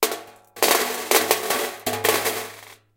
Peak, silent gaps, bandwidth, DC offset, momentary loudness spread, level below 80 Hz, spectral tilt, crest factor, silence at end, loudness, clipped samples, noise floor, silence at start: 0 dBFS; none; 17.5 kHz; under 0.1%; 11 LU; -62 dBFS; -1 dB/octave; 24 dB; 0.2 s; -21 LUFS; under 0.1%; -43 dBFS; 0 s